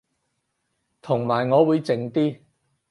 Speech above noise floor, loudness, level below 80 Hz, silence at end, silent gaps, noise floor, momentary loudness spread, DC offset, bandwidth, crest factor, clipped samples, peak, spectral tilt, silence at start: 54 dB; -22 LUFS; -70 dBFS; 0.55 s; none; -75 dBFS; 8 LU; under 0.1%; 11.5 kHz; 18 dB; under 0.1%; -6 dBFS; -8 dB/octave; 1.05 s